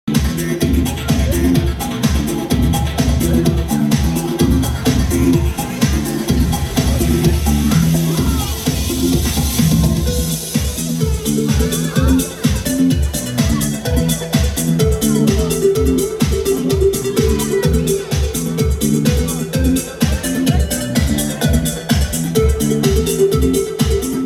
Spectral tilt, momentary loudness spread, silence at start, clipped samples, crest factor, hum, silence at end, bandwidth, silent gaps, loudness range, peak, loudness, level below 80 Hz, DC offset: -5.5 dB/octave; 4 LU; 0.05 s; under 0.1%; 14 dB; none; 0 s; 17 kHz; none; 1 LU; 0 dBFS; -16 LUFS; -22 dBFS; under 0.1%